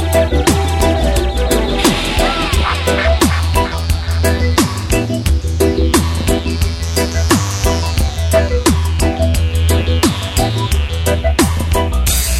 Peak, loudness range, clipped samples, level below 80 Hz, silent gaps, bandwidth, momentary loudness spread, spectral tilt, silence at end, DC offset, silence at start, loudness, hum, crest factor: 0 dBFS; 1 LU; under 0.1%; -18 dBFS; none; 16.5 kHz; 4 LU; -5 dB/octave; 0 s; under 0.1%; 0 s; -15 LUFS; none; 14 dB